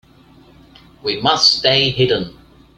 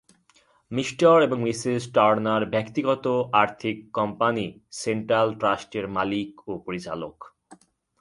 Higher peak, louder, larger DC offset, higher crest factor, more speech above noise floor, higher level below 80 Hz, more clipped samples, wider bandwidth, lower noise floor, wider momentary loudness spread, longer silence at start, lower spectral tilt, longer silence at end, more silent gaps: first, 0 dBFS vs -4 dBFS; first, -14 LUFS vs -24 LUFS; neither; about the same, 18 dB vs 20 dB; second, 31 dB vs 38 dB; first, -48 dBFS vs -62 dBFS; neither; about the same, 12 kHz vs 11.5 kHz; second, -47 dBFS vs -62 dBFS; about the same, 13 LU vs 13 LU; first, 1.05 s vs 0.7 s; second, -3.5 dB/octave vs -5.5 dB/octave; about the same, 0.45 s vs 0.45 s; neither